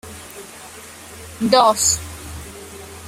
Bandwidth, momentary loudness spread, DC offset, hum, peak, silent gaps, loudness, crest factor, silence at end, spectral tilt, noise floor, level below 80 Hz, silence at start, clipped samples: 16.5 kHz; 22 LU; under 0.1%; none; 0 dBFS; none; -16 LUFS; 20 dB; 0 s; -2.5 dB/octave; -38 dBFS; -46 dBFS; 0.05 s; under 0.1%